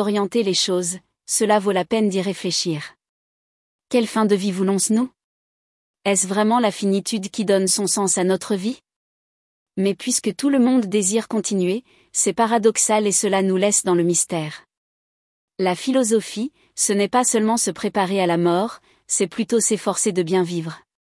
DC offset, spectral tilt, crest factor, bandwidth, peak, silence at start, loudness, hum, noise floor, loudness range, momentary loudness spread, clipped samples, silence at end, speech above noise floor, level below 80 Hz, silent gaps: under 0.1%; -3.5 dB/octave; 16 dB; 12 kHz; -4 dBFS; 0 s; -20 LUFS; none; under -90 dBFS; 3 LU; 9 LU; under 0.1%; 0.3 s; over 70 dB; -68 dBFS; 3.09-3.79 s, 5.24-5.94 s, 8.96-9.66 s, 14.77-15.48 s